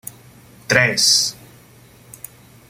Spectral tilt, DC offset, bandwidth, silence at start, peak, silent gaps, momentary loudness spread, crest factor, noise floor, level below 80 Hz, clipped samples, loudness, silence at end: -1.5 dB/octave; under 0.1%; 16.5 kHz; 0.05 s; 0 dBFS; none; 24 LU; 22 dB; -47 dBFS; -56 dBFS; under 0.1%; -15 LUFS; 1.35 s